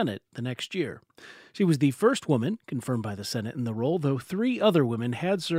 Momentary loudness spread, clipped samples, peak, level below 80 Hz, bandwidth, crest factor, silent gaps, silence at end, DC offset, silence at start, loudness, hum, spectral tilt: 11 LU; under 0.1%; -8 dBFS; -70 dBFS; 16 kHz; 20 dB; none; 0 s; under 0.1%; 0 s; -27 LUFS; none; -6.5 dB/octave